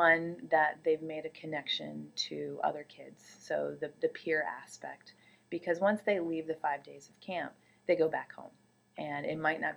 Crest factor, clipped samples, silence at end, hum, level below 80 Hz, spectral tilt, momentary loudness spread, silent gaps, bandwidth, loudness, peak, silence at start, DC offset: 22 dB; under 0.1%; 0 s; none; -84 dBFS; -4.5 dB/octave; 18 LU; none; 12 kHz; -34 LUFS; -12 dBFS; 0 s; under 0.1%